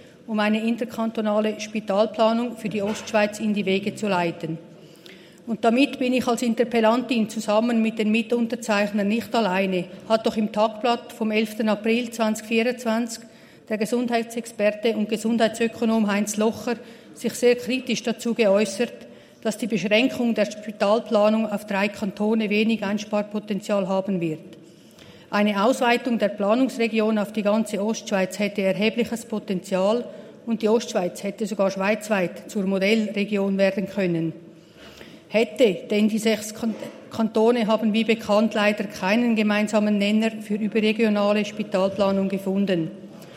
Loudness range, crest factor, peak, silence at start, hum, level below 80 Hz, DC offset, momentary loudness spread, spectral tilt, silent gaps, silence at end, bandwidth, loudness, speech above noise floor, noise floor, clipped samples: 3 LU; 18 dB; -6 dBFS; 0.05 s; none; -70 dBFS; under 0.1%; 8 LU; -5 dB/octave; none; 0 s; 15.5 kHz; -23 LUFS; 25 dB; -47 dBFS; under 0.1%